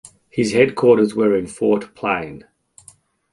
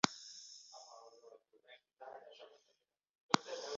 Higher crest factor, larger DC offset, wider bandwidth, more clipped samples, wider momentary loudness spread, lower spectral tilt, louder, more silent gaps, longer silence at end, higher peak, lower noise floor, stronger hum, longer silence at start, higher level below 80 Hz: second, 18 dB vs 36 dB; neither; first, 11.5 kHz vs 7.6 kHz; neither; second, 10 LU vs 26 LU; first, -6 dB/octave vs -2 dB/octave; first, -18 LUFS vs -41 LUFS; second, none vs 3.10-3.14 s, 3.20-3.29 s; first, 0.95 s vs 0 s; first, -2 dBFS vs -8 dBFS; second, -51 dBFS vs -81 dBFS; neither; first, 0.35 s vs 0.05 s; first, -56 dBFS vs -84 dBFS